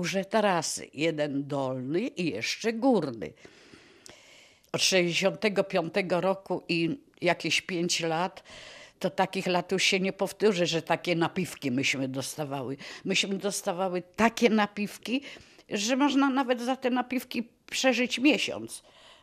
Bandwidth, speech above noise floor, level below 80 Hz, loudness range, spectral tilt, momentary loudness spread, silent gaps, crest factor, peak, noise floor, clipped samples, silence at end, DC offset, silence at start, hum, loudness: 14.5 kHz; 28 dB; -68 dBFS; 3 LU; -4 dB/octave; 11 LU; none; 22 dB; -6 dBFS; -57 dBFS; under 0.1%; 0.45 s; under 0.1%; 0 s; none; -28 LUFS